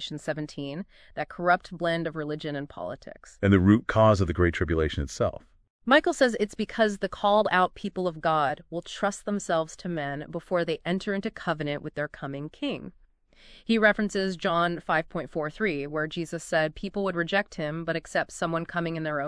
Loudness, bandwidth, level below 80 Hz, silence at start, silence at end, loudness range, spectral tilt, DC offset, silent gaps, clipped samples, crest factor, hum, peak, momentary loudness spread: -27 LUFS; 11 kHz; -48 dBFS; 0 s; 0 s; 6 LU; -6 dB/octave; under 0.1%; 5.70-5.79 s; under 0.1%; 20 dB; none; -6 dBFS; 14 LU